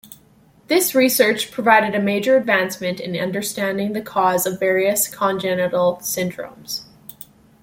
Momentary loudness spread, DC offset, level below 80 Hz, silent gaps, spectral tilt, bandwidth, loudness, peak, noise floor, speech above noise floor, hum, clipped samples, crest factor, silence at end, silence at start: 12 LU; under 0.1%; -62 dBFS; none; -3.5 dB/octave; 17 kHz; -19 LUFS; -2 dBFS; -52 dBFS; 34 dB; none; under 0.1%; 18 dB; 0.8 s; 0.1 s